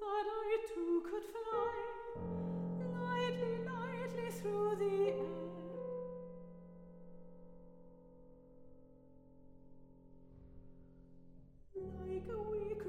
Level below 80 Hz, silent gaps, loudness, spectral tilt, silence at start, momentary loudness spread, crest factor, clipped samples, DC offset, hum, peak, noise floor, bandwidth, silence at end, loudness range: -64 dBFS; none; -41 LUFS; -7 dB/octave; 0 s; 24 LU; 16 dB; under 0.1%; under 0.1%; none; -26 dBFS; -61 dBFS; 16 kHz; 0 s; 23 LU